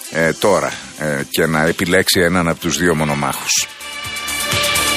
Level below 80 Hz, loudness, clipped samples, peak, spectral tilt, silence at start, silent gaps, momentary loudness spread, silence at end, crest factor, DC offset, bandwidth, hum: -42 dBFS; -16 LUFS; under 0.1%; -2 dBFS; -3 dB/octave; 0 s; none; 10 LU; 0 s; 16 dB; under 0.1%; 15.5 kHz; none